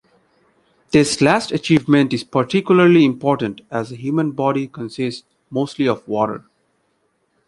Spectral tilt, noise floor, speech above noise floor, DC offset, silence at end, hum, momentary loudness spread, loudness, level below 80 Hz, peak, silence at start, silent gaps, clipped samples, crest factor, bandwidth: -6 dB/octave; -66 dBFS; 49 dB; under 0.1%; 1.1 s; none; 13 LU; -18 LUFS; -56 dBFS; -2 dBFS; 0.9 s; none; under 0.1%; 18 dB; 11.5 kHz